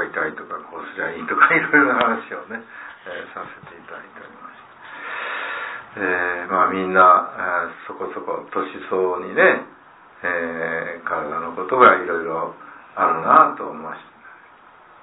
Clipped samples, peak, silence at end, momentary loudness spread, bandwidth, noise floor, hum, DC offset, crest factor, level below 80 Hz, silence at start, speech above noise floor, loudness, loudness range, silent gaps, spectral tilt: under 0.1%; 0 dBFS; 0.7 s; 23 LU; 4 kHz; -48 dBFS; none; under 0.1%; 22 dB; -64 dBFS; 0 s; 28 dB; -19 LUFS; 10 LU; none; -8.5 dB/octave